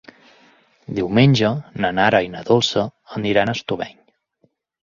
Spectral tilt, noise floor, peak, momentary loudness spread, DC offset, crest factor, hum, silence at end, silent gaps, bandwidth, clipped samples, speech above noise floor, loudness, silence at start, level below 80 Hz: -6 dB/octave; -64 dBFS; -2 dBFS; 12 LU; under 0.1%; 18 dB; none; 1 s; none; 7.4 kHz; under 0.1%; 46 dB; -19 LUFS; 0.9 s; -52 dBFS